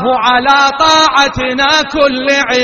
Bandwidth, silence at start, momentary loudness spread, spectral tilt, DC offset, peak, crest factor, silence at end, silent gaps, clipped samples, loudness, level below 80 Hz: 11.5 kHz; 0 s; 4 LU; -2.5 dB/octave; under 0.1%; 0 dBFS; 10 dB; 0 s; none; 0.2%; -9 LUFS; -38 dBFS